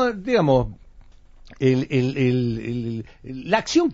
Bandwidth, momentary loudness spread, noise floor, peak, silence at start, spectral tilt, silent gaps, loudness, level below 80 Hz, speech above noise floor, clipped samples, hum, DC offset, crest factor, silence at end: 7.6 kHz; 14 LU; -47 dBFS; -4 dBFS; 0 s; -6 dB/octave; none; -22 LUFS; -44 dBFS; 25 dB; under 0.1%; none; under 0.1%; 18 dB; 0 s